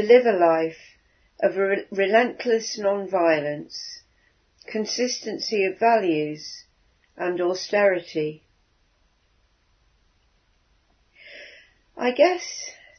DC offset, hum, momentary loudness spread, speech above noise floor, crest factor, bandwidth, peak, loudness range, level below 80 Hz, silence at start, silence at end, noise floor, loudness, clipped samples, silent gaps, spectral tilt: under 0.1%; none; 16 LU; 43 dB; 22 dB; 6.6 kHz; -2 dBFS; 5 LU; -68 dBFS; 0 s; 0.25 s; -65 dBFS; -23 LUFS; under 0.1%; none; -4 dB/octave